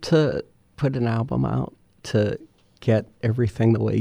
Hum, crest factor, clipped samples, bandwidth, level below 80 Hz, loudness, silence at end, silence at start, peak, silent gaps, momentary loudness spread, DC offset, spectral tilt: none; 16 dB; under 0.1%; 10.5 kHz; -48 dBFS; -23 LUFS; 0 s; 0 s; -8 dBFS; none; 11 LU; under 0.1%; -8 dB/octave